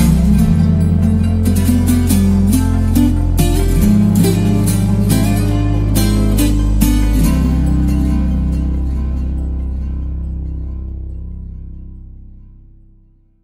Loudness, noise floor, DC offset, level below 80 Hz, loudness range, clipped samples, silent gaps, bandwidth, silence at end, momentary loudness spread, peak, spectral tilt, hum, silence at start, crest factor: -14 LUFS; -48 dBFS; under 0.1%; -18 dBFS; 12 LU; under 0.1%; none; 16.5 kHz; 1.15 s; 14 LU; 0 dBFS; -7 dB/octave; none; 0 s; 12 dB